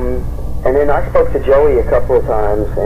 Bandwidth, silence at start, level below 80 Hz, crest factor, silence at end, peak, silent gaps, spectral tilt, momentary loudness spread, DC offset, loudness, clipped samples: 14.5 kHz; 0 s; -22 dBFS; 8 dB; 0 s; -4 dBFS; none; -8.5 dB/octave; 9 LU; under 0.1%; -14 LUFS; under 0.1%